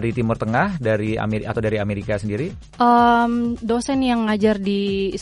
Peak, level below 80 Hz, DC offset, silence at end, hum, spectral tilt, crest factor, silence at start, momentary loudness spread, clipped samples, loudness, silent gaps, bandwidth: -4 dBFS; -42 dBFS; under 0.1%; 0 s; none; -6.5 dB/octave; 16 dB; 0 s; 9 LU; under 0.1%; -20 LUFS; none; 11.5 kHz